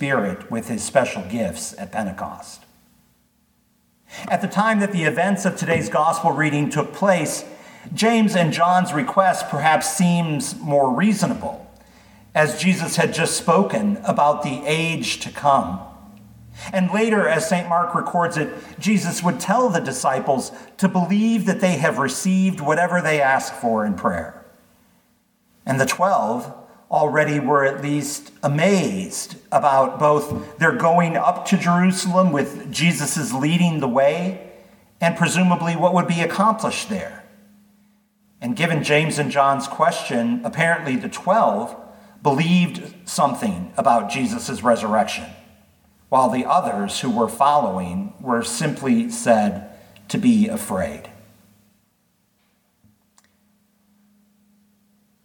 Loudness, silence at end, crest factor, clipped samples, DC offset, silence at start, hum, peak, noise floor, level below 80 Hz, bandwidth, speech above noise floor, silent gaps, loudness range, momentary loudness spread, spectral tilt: -20 LUFS; 4.15 s; 18 dB; under 0.1%; under 0.1%; 0 s; none; -2 dBFS; -65 dBFS; -60 dBFS; 19 kHz; 46 dB; none; 4 LU; 11 LU; -5 dB/octave